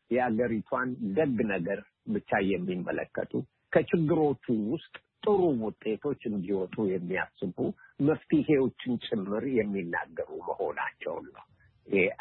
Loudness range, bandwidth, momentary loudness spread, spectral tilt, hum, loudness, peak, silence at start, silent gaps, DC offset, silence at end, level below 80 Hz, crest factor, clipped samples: 2 LU; 4.2 kHz; 9 LU; -11 dB/octave; none; -30 LUFS; -10 dBFS; 0.1 s; none; under 0.1%; 0.05 s; -64 dBFS; 20 dB; under 0.1%